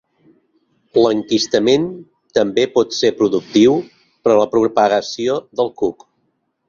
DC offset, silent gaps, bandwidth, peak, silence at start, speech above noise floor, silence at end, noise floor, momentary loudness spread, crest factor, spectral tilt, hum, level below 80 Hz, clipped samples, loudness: under 0.1%; none; 7.4 kHz; 0 dBFS; 0.95 s; 52 dB; 0.75 s; -67 dBFS; 8 LU; 16 dB; -4.5 dB/octave; none; -58 dBFS; under 0.1%; -16 LUFS